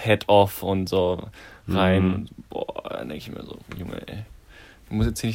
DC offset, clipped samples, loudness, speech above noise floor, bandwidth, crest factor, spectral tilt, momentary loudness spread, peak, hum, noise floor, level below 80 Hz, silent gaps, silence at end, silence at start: under 0.1%; under 0.1%; -24 LUFS; 25 dB; 16 kHz; 20 dB; -6 dB/octave; 20 LU; -4 dBFS; none; -49 dBFS; -42 dBFS; none; 0 s; 0 s